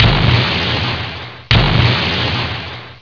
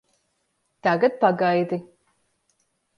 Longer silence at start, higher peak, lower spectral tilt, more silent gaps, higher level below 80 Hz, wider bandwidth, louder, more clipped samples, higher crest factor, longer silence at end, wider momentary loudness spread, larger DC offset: second, 0 s vs 0.85 s; first, 0 dBFS vs -4 dBFS; second, -6 dB/octave vs -7.5 dB/octave; neither; first, -26 dBFS vs -74 dBFS; second, 5.4 kHz vs 10.5 kHz; first, -14 LUFS vs -22 LUFS; neither; second, 14 dB vs 20 dB; second, 0.05 s vs 1.15 s; first, 13 LU vs 9 LU; first, 0.4% vs under 0.1%